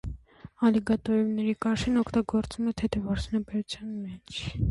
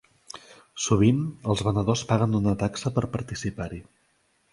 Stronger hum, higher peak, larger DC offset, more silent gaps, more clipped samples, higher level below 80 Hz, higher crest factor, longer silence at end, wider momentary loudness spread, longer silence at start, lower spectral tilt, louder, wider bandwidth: neither; second, -12 dBFS vs -6 dBFS; neither; neither; neither; about the same, -44 dBFS vs -46 dBFS; about the same, 16 dB vs 20 dB; second, 0 s vs 0.7 s; second, 11 LU vs 22 LU; second, 0.05 s vs 0.35 s; about the same, -6.5 dB/octave vs -6 dB/octave; second, -28 LUFS vs -25 LUFS; about the same, 11.5 kHz vs 11.5 kHz